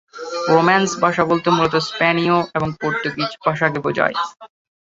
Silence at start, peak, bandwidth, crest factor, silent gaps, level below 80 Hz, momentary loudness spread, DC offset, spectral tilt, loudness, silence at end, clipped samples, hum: 0.15 s; -2 dBFS; 8 kHz; 18 dB; none; -54 dBFS; 8 LU; under 0.1%; -5 dB/octave; -18 LUFS; 0.45 s; under 0.1%; none